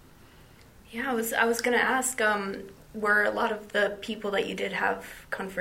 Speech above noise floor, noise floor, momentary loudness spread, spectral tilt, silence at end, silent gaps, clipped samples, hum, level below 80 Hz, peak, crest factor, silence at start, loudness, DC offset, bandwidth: 25 dB; -53 dBFS; 12 LU; -2.5 dB/octave; 0 s; none; under 0.1%; none; -60 dBFS; -10 dBFS; 20 dB; 0.9 s; -27 LUFS; under 0.1%; 16 kHz